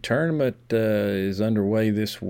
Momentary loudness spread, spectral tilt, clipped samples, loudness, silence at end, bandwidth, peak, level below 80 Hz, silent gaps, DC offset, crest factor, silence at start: 3 LU; -7 dB/octave; under 0.1%; -23 LUFS; 0 s; 17.5 kHz; -10 dBFS; -56 dBFS; none; under 0.1%; 12 dB; 0.05 s